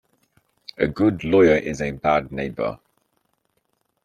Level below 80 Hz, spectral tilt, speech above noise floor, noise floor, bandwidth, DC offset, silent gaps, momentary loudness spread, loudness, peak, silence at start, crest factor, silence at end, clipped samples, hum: -48 dBFS; -7 dB/octave; 51 dB; -71 dBFS; 10 kHz; under 0.1%; none; 20 LU; -21 LUFS; -4 dBFS; 0.8 s; 20 dB; 1.3 s; under 0.1%; none